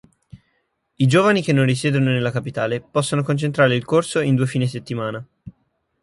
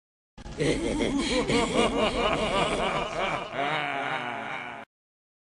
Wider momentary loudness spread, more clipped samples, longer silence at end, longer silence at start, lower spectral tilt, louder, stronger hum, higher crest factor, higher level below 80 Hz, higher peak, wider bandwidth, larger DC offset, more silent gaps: about the same, 10 LU vs 9 LU; neither; second, 0.55 s vs 0.75 s; about the same, 0.35 s vs 0.35 s; first, -6 dB/octave vs -4 dB/octave; first, -19 LUFS vs -27 LUFS; neither; about the same, 16 dB vs 18 dB; second, -56 dBFS vs -44 dBFS; first, -4 dBFS vs -10 dBFS; about the same, 11.5 kHz vs 11.5 kHz; neither; neither